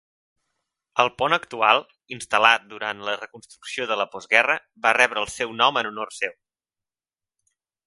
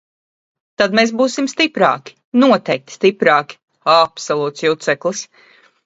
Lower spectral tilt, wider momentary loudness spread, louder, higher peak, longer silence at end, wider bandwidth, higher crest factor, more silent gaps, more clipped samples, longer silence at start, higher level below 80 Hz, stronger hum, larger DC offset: second, -2 dB/octave vs -4 dB/octave; first, 13 LU vs 10 LU; second, -22 LUFS vs -16 LUFS; about the same, 0 dBFS vs 0 dBFS; first, 1.55 s vs 0.6 s; first, 11.5 kHz vs 8 kHz; first, 24 dB vs 16 dB; second, none vs 2.24-2.32 s, 3.63-3.68 s; neither; first, 0.95 s vs 0.8 s; about the same, -64 dBFS vs -64 dBFS; neither; neither